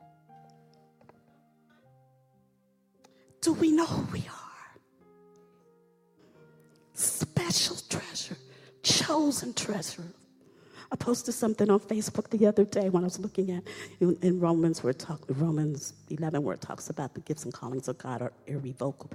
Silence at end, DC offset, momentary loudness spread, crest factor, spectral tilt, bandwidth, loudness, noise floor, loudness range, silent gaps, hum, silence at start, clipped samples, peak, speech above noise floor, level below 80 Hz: 0 s; under 0.1%; 13 LU; 20 dB; -4.5 dB/octave; 16 kHz; -29 LUFS; -69 dBFS; 8 LU; none; none; 0.35 s; under 0.1%; -10 dBFS; 40 dB; -66 dBFS